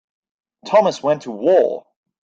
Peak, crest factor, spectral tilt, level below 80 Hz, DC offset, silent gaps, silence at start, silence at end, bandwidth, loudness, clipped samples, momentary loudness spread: -2 dBFS; 16 dB; -5.5 dB/octave; -68 dBFS; under 0.1%; none; 0.65 s; 0.45 s; 7.6 kHz; -17 LUFS; under 0.1%; 6 LU